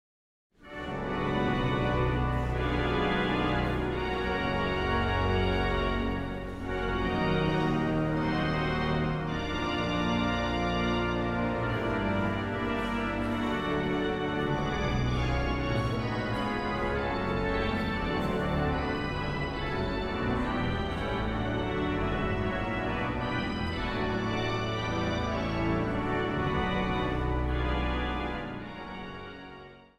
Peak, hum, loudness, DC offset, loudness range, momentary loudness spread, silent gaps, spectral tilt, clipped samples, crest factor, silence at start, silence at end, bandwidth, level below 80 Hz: -16 dBFS; none; -30 LUFS; under 0.1%; 2 LU; 4 LU; none; -7 dB/octave; under 0.1%; 14 dB; 0.6 s; 0.15 s; 12.5 kHz; -38 dBFS